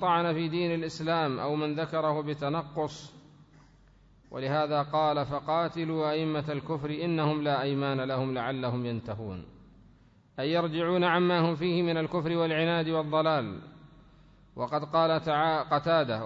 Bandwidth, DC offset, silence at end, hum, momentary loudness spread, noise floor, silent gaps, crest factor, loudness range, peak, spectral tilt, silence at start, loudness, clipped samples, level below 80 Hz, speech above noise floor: 7.8 kHz; under 0.1%; 0 s; none; 10 LU; -59 dBFS; none; 16 dB; 5 LU; -12 dBFS; -7 dB/octave; 0 s; -29 LUFS; under 0.1%; -62 dBFS; 31 dB